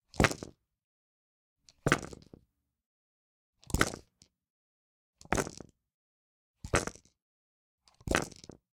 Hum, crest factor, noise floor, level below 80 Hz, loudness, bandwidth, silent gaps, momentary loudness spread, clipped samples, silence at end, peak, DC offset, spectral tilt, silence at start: none; 34 dB; -70 dBFS; -48 dBFS; -33 LUFS; 17 kHz; 0.84-1.56 s, 2.86-3.53 s, 4.50-5.13 s, 5.94-6.54 s, 7.22-7.78 s; 22 LU; under 0.1%; 0.4 s; -4 dBFS; under 0.1%; -4 dB/octave; 0.15 s